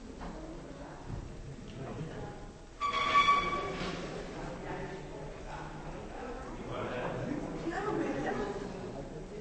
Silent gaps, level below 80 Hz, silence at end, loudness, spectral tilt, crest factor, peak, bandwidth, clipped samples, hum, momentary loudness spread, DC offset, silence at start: none; -50 dBFS; 0 s; -36 LUFS; -5 dB/octave; 22 dB; -14 dBFS; 8.4 kHz; under 0.1%; none; 17 LU; under 0.1%; 0 s